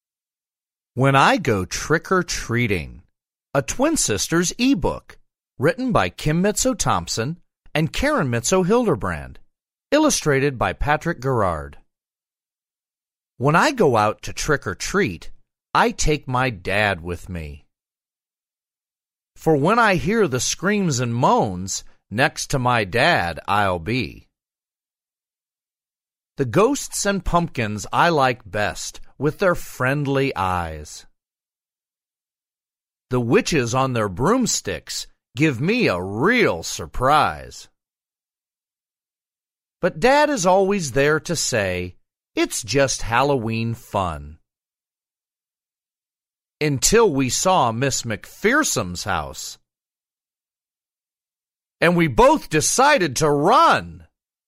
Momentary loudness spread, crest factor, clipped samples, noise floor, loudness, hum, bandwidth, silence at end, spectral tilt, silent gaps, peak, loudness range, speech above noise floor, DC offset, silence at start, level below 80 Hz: 12 LU; 20 dB; under 0.1%; under -90 dBFS; -20 LUFS; none; 16 kHz; 0.5 s; -4 dB/octave; none; -2 dBFS; 6 LU; over 70 dB; under 0.1%; 0.95 s; -40 dBFS